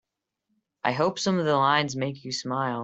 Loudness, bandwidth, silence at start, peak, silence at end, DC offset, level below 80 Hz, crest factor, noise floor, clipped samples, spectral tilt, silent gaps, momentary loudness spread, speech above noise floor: -25 LUFS; 8.2 kHz; 0.85 s; -6 dBFS; 0 s; under 0.1%; -68 dBFS; 20 dB; -79 dBFS; under 0.1%; -4.5 dB/octave; none; 9 LU; 54 dB